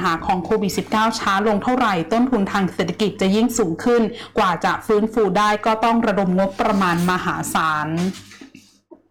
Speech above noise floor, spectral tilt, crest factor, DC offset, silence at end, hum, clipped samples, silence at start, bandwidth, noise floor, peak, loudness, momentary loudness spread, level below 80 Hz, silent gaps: 30 dB; -5.5 dB/octave; 8 dB; under 0.1%; 0.15 s; none; under 0.1%; 0 s; 18.5 kHz; -49 dBFS; -12 dBFS; -19 LUFS; 4 LU; -48 dBFS; none